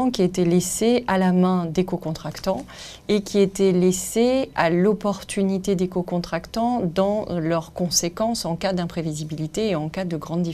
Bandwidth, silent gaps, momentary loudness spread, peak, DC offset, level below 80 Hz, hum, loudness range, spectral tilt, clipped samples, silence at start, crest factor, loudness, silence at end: 15 kHz; none; 9 LU; -4 dBFS; under 0.1%; -48 dBFS; none; 3 LU; -5.5 dB/octave; under 0.1%; 0 s; 18 dB; -22 LUFS; 0 s